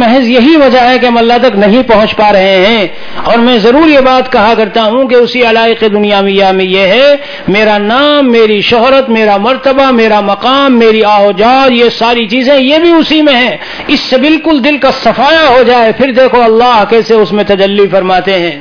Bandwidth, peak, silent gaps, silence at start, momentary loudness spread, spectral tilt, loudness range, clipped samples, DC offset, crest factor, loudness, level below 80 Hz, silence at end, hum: 5.4 kHz; 0 dBFS; none; 0 s; 4 LU; -5.5 dB/octave; 1 LU; 3%; under 0.1%; 6 dB; -6 LUFS; -36 dBFS; 0 s; none